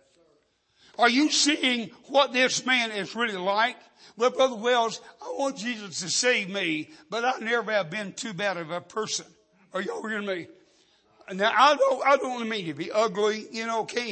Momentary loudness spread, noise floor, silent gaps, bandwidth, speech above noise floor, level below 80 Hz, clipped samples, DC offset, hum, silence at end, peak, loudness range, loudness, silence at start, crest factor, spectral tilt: 12 LU; -67 dBFS; none; 8.8 kHz; 41 dB; -80 dBFS; under 0.1%; under 0.1%; none; 0 s; -6 dBFS; 6 LU; -25 LUFS; 1 s; 20 dB; -2.5 dB/octave